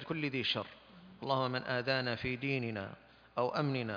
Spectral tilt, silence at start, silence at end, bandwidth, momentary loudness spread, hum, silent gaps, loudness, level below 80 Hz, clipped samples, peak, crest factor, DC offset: -7 dB/octave; 0 s; 0 s; 5.2 kHz; 13 LU; none; none; -35 LUFS; -68 dBFS; under 0.1%; -16 dBFS; 20 dB; under 0.1%